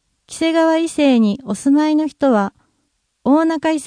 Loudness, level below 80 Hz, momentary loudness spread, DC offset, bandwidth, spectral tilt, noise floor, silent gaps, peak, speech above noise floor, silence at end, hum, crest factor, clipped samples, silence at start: -16 LUFS; -58 dBFS; 7 LU; under 0.1%; 10.5 kHz; -5.5 dB/octave; -68 dBFS; none; -2 dBFS; 53 dB; 0 s; none; 14 dB; under 0.1%; 0.3 s